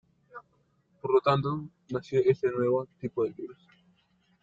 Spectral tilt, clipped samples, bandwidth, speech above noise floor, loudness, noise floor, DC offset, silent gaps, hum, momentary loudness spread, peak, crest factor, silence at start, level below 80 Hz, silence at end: -8 dB/octave; under 0.1%; 7.4 kHz; 42 dB; -29 LUFS; -70 dBFS; under 0.1%; none; none; 24 LU; -10 dBFS; 20 dB; 0.35 s; -68 dBFS; 0.9 s